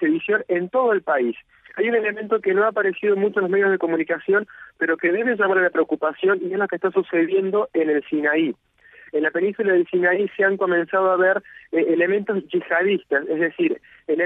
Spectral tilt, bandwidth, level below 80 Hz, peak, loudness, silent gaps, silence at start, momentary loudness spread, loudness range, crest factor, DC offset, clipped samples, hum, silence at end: -8.5 dB/octave; 3.9 kHz; -70 dBFS; -6 dBFS; -21 LUFS; none; 0 s; 5 LU; 1 LU; 14 dB; under 0.1%; under 0.1%; none; 0 s